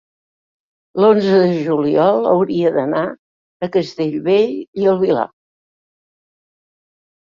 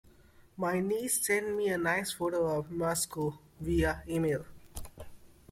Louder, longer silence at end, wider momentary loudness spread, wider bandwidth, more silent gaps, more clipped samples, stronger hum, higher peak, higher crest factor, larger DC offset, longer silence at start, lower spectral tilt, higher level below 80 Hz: first, -16 LUFS vs -32 LUFS; first, 2.05 s vs 0.25 s; second, 8 LU vs 15 LU; second, 7.2 kHz vs 16.5 kHz; first, 3.19-3.60 s, 4.68-4.73 s vs none; neither; neither; first, -2 dBFS vs -16 dBFS; about the same, 16 dB vs 16 dB; neither; first, 0.95 s vs 0.4 s; first, -8 dB/octave vs -4.5 dB/octave; second, -62 dBFS vs -50 dBFS